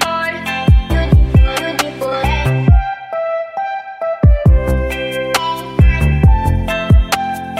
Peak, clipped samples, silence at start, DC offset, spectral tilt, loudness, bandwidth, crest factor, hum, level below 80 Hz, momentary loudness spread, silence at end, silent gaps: 0 dBFS; under 0.1%; 0 s; under 0.1%; -6 dB/octave; -15 LUFS; 15.5 kHz; 12 dB; none; -16 dBFS; 9 LU; 0 s; none